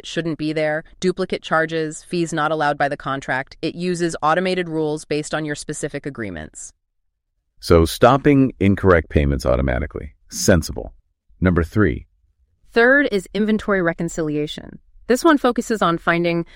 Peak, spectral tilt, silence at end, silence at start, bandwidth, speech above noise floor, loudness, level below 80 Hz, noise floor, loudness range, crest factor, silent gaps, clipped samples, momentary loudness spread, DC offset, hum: -2 dBFS; -5.5 dB/octave; 0.1 s; 0.05 s; 16.5 kHz; 53 dB; -19 LUFS; -34 dBFS; -72 dBFS; 6 LU; 18 dB; none; under 0.1%; 15 LU; under 0.1%; none